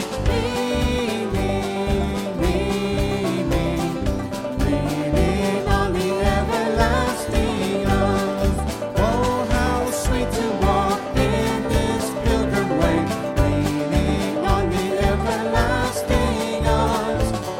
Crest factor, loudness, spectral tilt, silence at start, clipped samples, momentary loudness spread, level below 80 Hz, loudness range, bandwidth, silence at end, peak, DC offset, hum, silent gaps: 18 dB; -21 LUFS; -5.5 dB/octave; 0 s; under 0.1%; 3 LU; -28 dBFS; 2 LU; 17 kHz; 0 s; -2 dBFS; under 0.1%; none; none